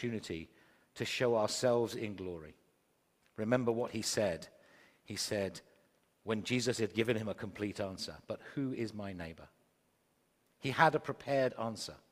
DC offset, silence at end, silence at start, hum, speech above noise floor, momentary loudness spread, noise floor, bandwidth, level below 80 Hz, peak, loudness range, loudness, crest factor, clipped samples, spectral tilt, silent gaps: under 0.1%; 0.15 s; 0 s; none; 40 dB; 15 LU; -75 dBFS; 15.5 kHz; -72 dBFS; -12 dBFS; 4 LU; -36 LUFS; 24 dB; under 0.1%; -4.5 dB/octave; none